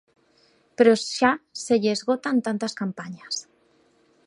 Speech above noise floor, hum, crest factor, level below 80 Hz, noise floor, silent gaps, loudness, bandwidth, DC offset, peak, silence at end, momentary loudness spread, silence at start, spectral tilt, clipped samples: 39 dB; none; 20 dB; -68 dBFS; -62 dBFS; none; -23 LUFS; 11 kHz; under 0.1%; -4 dBFS; 0.85 s; 13 LU; 0.8 s; -4 dB/octave; under 0.1%